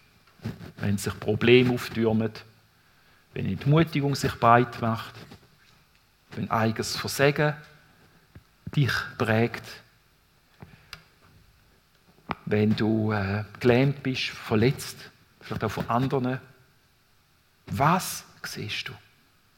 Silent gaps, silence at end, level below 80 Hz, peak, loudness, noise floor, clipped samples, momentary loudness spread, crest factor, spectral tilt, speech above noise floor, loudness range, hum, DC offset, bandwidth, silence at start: none; 0.6 s; -58 dBFS; -2 dBFS; -25 LUFS; -63 dBFS; under 0.1%; 19 LU; 24 dB; -6 dB/octave; 38 dB; 6 LU; none; under 0.1%; 17 kHz; 0.4 s